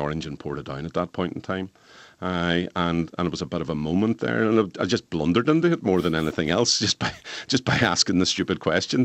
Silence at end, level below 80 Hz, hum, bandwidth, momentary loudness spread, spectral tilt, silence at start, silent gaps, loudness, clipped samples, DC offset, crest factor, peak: 0 s; -50 dBFS; none; 12 kHz; 11 LU; -4.5 dB/octave; 0 s; none; -24 LUFS; under 0.1%; under 0.1%; 20 dB; -4 dBFS